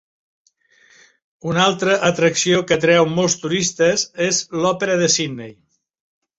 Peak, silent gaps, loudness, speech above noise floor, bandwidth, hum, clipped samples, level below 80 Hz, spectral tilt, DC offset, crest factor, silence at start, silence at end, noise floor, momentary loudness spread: -2 dBFS; none; -17 LUFS; 38 dB; 8.2 kHz; none; under 0.1%; -58 dBFS; -3.5 dB/octave; under 0.1%; 18 dB; 1.45 s; 0.85 s; -55 dBFS; 7 LU